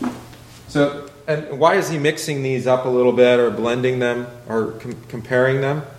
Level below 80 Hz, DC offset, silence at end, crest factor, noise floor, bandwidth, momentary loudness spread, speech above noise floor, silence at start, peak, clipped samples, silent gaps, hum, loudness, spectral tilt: -54 dBFS; under 0.1%; 0 s; 18 dB; -40 dBFS; 15 kHz; 14 LU; 22 dB; 0 s; 0 dBFS; under 0.1%; none; none; -19 LUFS; -5.5 dB/octave